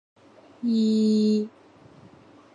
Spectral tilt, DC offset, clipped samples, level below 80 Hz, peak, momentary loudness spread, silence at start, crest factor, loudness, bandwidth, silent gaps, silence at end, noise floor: -7.5 dB/octave; under 0.1%; under 0.1%; -74 dBFS; -14 dBFS; 10 LU; 0.6 s; 12 dB; -23 LUFS; 7.4 kHz; none; 1.05 s; -52 dBFS